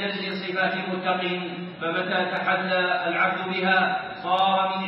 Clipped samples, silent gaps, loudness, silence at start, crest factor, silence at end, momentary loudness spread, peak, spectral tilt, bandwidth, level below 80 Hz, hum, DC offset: under 0.1%; none; -24 LUFS; 0 s; 16 dB; 0 s; 7 LU; -8 dBFS; -2 dB/octave; 5.8 kHz; -72 dBFS; none; under 0.1%